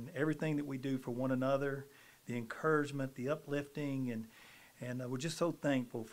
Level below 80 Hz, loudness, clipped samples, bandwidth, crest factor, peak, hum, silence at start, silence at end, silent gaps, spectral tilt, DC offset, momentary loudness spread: -76 dBFS; -38 LUFS; under 0.1%; 16 kHz; 16 dB; -20 dBFS; none; 0 s; 0 s; none; -6.5 dB/octave; under 0.1%; 13 LU